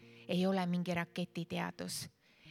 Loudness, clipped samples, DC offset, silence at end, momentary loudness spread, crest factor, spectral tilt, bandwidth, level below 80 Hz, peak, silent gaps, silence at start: -38 LUFS; under 0.1%; under 0.1%; 0 s; 8 LU; 18 dB; -5.5 dB/octave; 15.5 kHz; -76 dBFS; -20 dBFS; none; 0 s